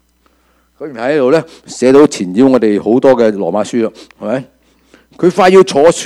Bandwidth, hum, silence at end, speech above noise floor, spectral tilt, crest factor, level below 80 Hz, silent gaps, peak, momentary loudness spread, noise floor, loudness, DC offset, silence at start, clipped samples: 12.5 kHz; none; 0 s; 44 dB; -5.5 dB/octave; 12 dB; -50 dBFS; none; 0 dBFS; 13 LU; -54 dBFS; -11 LUFS; under 0.1%; 0.8 s; 0.6%